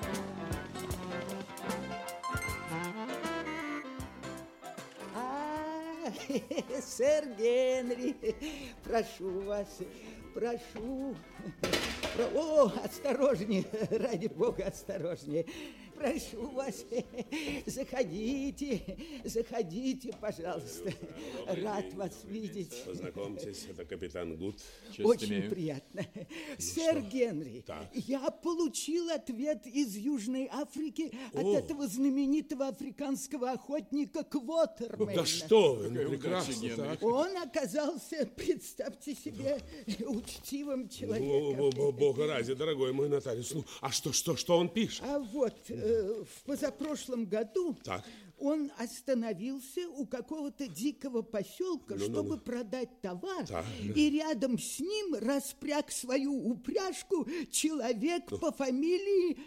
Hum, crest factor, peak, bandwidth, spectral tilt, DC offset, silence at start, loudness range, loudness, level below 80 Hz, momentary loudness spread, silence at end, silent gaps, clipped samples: none; 20 dB; -14 dBFS; 16.5 kHz; -4.5 dB/octave; under 0.1%; 0 s; 7 LU; -35 LUFS; -60 dBFS; 12 LU; 0 s; none; under 0.1%